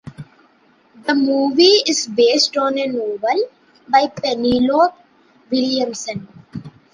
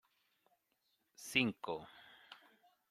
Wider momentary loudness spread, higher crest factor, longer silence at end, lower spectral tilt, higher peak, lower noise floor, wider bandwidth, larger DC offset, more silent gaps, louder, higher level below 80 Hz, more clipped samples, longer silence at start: second, 17 LU vs 25 LU; second, 16 dB vs 30 dB; second, 0.25 s vs 0.55 s; about the same, -3 dB/octave vs -3.5 dB/octave; first, -2 dBFS vs -16 dBFS; second, -54 dBFS vs -82 dBFS; second, 10.5 kHz vs 15.5 kHz; neither; neither; first, -17 LUFS vs -38 LUFS; first, -56 dBFS vs -80 dBFS; neither; second, 0.05 s vs 1.2 s